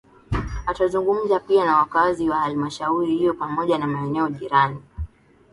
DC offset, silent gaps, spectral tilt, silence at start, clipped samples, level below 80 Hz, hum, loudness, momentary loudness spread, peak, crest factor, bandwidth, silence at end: under 0.1%; none; -7 dB/octave; 0.3 s; under 0.1%; -40 dBFS; none; -21 LUFS; 10 LU; -4 dBFS; 18 dB; 11.5 kHz; 0.45 s